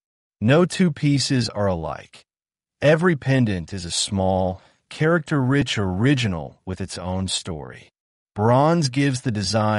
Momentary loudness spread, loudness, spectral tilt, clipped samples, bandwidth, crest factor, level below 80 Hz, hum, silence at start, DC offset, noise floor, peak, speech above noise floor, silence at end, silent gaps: 14 LU; -21 LUFS; -5.5 dB/octave; under 0.1%; 11.5 kHz; 18 dB; -50 dBFS; none; 0.4 s; under 0.1%; under -90 dBFS; -4 dBFS; over 69 dB; 0 s; 8.00-8.26 s